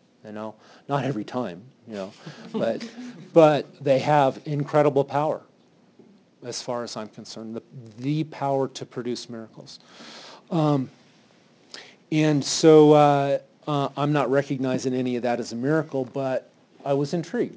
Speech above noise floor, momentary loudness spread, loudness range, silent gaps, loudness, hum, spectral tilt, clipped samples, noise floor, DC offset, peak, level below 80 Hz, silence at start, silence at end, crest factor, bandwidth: 35 dB; 23 LU; 11 LU; none; -23 LUFS; none; -6 dB/octave; under 0.1%; -58 dBFS; under 0.1%; -4 dBFS; -74 dBFS; 0.25 s; 0 s; 20 dB; 8 kHz